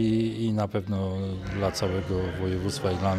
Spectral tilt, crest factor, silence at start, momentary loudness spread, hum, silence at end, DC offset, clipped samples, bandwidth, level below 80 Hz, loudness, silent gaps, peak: -6.5 dB/octave; 14 dB; 0 s; 4 LU; none; 0 s; under 0.1%; under 0.1%; 14 kHz; -48 dBFS; -28 LUFS; none; -12 dBFS